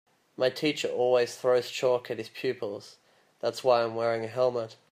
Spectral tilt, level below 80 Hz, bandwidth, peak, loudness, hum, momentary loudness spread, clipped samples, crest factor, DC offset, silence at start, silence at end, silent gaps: -4.5 dB/octave; -80 dBFS; 15.5 kHz; -10 dBFS; -28 LUFS; none; 10 LU; under 0.1%; 18 dB; under 0.1%; 0.4 s; 0.15 s; none